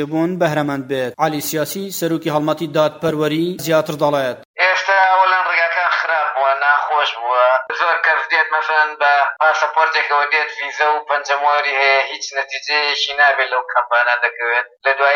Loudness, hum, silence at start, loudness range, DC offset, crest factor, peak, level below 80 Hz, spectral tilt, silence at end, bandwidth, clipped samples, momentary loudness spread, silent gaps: -16 LUFS; none; 0 s; 4 LU; under 0.1%; 14 dB; -2 dBFS; -68 dBFS; -3.5 dB/octave; 0 s; 17 kHz; under 0.1%; 7 LU; 4.45-4.54 s